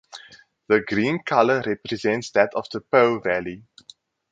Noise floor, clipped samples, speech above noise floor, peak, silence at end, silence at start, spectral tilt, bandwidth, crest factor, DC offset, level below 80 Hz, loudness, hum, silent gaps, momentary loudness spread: -50 dBFS; under 0.1%; 29 dB; 0 dBFS; 0.7 s; 0.15 s; -5.5 dB/octave; 9 kHz; 22 dB; under 0.1%; -60 dBFS; -22 LUFS; none; none; 15 LU